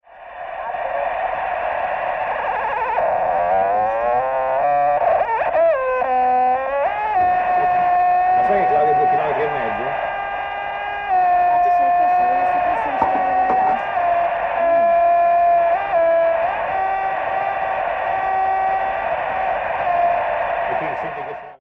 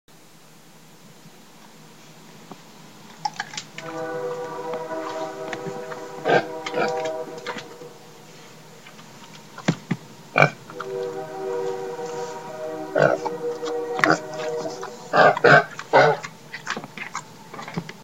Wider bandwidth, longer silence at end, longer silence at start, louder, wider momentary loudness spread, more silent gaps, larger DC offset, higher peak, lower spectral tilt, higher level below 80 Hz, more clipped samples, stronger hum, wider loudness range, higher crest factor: second, 5.2 kHz vs 16.5 kHz; about the same, 0.05 s vs 0 s; second, 0.1 s vs 1.05 s; first, -18 LUFS vs -24 LUFS; second, 7 LU vs 26 LU; neither; second, under 0.1% vs 0.3%; about the same, -2 dBFS vs 0 dBFS; first, -6.5 dB/octave vs -5 dB/octave; first, -50 dBFS vs -68 dBFS; neither; neither; second, 4 LU vs 14 LU; second, 16 dB vs 26 dB